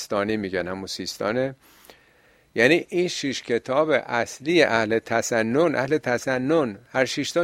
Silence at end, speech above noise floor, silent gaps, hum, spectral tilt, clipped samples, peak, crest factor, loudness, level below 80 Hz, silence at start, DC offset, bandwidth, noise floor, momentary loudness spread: 0 s; 35 dB; none; none; -4.5 dB/octave; under 0.1%; -2 dBFS; 20 dB; -23 LUFS; -62 dBFS; 0 s; under 0.1%; 16 kHz; -58 dBFS; 9 LU